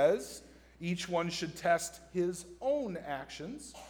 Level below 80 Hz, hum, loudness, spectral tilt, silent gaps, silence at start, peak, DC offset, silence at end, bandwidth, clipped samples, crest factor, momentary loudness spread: -62 dBFS; none; -35 LUFS; -4.5 dB/octave; none; 0 s; -16 dBFS; under 0.1%; 0 s; over 20 kHz; under 0.1%; 18 dB; 12 LU